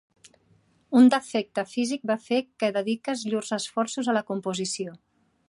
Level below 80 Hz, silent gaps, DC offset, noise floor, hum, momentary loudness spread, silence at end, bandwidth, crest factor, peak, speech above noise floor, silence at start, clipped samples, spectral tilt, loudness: -76 dBFS; none; under 0.1%; -63 dBFS; none; 11 LU; 0.55 s; 11.5 kHz; 20 dB; -8 dBFS; 38 dB; 0.9 s; under 0.1%; -4.5 dB/octave; -26 LUFS